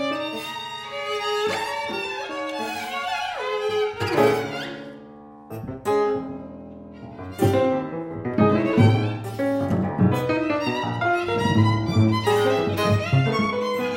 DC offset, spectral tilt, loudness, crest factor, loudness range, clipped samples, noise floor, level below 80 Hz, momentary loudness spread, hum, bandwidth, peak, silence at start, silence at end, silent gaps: under 0.1%; -6.5 dB/octave; -23 LUFS; 18 dB; 6 LU; under 0.1%; -43 dBFS; -54 dBFS; 15 LU; none; 16.5 kHz; -4 dBFS; 0 s; 0 s; none